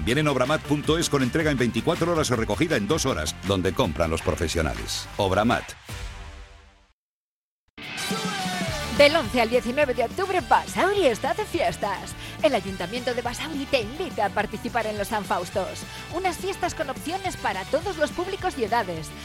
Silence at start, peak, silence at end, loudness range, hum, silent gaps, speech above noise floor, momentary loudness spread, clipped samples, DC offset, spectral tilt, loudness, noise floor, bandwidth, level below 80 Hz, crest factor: 0 s; -6 dBFS; 0 s; 6 LU; none; 6.93-7.77 s; over 66 dB; 8 LU; under 0.1%; under 0.1%; -4.5 dB/octave; -25 LUFS; under -90 dBFS; 16.5 kHz; -42 dBFS; 20 dB